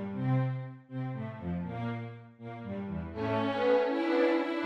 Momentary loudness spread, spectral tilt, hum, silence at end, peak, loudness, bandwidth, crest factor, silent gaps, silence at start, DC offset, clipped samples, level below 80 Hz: 14 LU; -8.5 dB/octave; none; 0 s; -16 dBFS; -32 LUFS; 6.6 kHz; 16 dB; none; 0 s; under 0.1%; under 0.1%; -60 dBFS